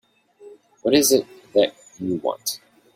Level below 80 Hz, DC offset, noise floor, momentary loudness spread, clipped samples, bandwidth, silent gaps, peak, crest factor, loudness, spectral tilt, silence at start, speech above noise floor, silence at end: -62 dBFS; under 0.1%; -48 dBFS; 12 LU; under 0.1%; 16.5 kHz; none; -4 dBFS; 20 dB; -21 LUFS; -3 dB/octave; 0.45 s; 28 dB; 0.4 s